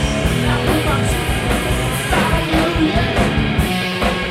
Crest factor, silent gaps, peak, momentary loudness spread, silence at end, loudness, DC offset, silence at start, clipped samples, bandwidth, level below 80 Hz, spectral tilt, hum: 14 dB; none; -2 dBFS; 2 LU; 0 s; -17 LUFS; under 0.1%; 0 s; under 0.1%; 16.5 kHz; -24 dBFS; -5 dB/octave; none